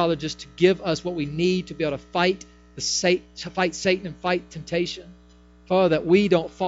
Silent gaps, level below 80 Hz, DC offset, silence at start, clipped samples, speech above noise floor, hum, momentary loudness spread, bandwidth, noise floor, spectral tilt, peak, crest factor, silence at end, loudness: none; -52 dBFS; under 0.1%; 0 s; under 0.1%; 28 dB; 60 Hz at -45 dBFS; 10 LU; 8 kHz; -51 dBFS; -4.5 dB/octave; -4 dBFS; 18 dB; 0 s; -23 LUFS